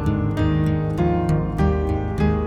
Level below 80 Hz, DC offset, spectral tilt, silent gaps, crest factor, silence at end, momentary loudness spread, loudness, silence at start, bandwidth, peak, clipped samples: -28 dBFS; under 0.1%; -9 dB/octave; none; 14 dB; 0 s; 2 LU; -21 LUFS; 0 s; 9.6 kHz; -6 dBFS; under 0.1%